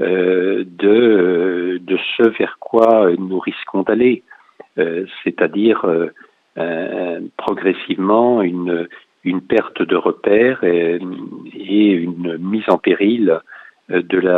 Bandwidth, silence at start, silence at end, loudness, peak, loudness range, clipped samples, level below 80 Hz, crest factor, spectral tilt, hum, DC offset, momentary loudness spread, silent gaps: 4.4 kHz; 0 s; 0 s; -16 LUFS; 0 dBFS; 4 LU; under 0.1%; -62 dBFS; 16 dB; -8.5 dB/octave; none; under 0.1%; 10 LU; none